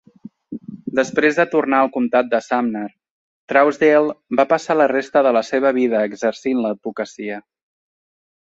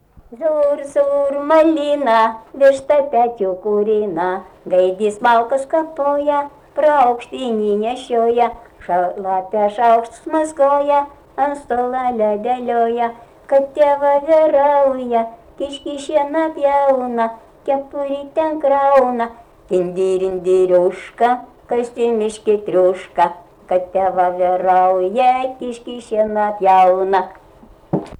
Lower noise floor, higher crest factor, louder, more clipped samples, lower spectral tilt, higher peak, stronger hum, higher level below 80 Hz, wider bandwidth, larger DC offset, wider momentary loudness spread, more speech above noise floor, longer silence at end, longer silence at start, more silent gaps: second, -39 dBFS vs -45 dBFS; about the same, 16 dB vs 12 dB; about the same, -18 LUFS vs -16 LUFS; neither; about the same, -5.5 dB/octave vs -5.5 dB/octave; about the same, -2 dBFS vs -4 dBFS; neither; second, -66 dBFS vs -52 dBFS; second, 8 kHz vs 10.5 kHz; neither; first, 14 LU vs 10 LU; second, 22 dB vs 29 dB; first, 1.05 s vs 0.05 s; first, 0.5 s vs 0.3 s; first, 3.11-3.48 s vs none